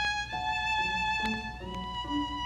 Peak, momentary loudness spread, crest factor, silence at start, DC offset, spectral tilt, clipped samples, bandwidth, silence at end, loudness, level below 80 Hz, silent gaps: -20 dBFS; 8 LU; 12 dB; 0 s; under 0.1%; -3.5 dB/octave; under 0.1%; 13.5 kHz; 0 s; -31 LUFS; -46 dBFS; none